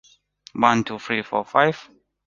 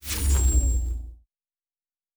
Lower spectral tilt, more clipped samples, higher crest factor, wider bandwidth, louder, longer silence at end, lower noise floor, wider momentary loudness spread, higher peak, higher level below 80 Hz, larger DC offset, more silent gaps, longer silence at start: about the same, -5 dB/octave vs -4 dB/octave; neither; first, 22 dB vs 14 dB; second, 7.4 kHz vs over 20 kHz; first, -21 LUFS vs -24 LUFS; second, 0.45 s vs 1 s; second, -52 dBFS vs under -90 dBFS; second, 12 LU vs 15 LU; first, -2 dBFS vs -12 dBFS; second, -62 dBFS vs -26 dBFS; neither; neither; first, 0.55 s vs 0.05 s